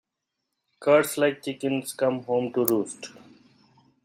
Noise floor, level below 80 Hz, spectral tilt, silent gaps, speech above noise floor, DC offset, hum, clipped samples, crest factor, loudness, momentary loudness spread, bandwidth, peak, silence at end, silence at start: -82 dBFS; -72 dBFS; -4.5 dB/octave; none; 58 dB; under 0.1%; none; under 0.1%; 24 dB; -25 LUFS; 12 LU; 16 kHz; -4 dBFS; 0.95 s; 0.8 s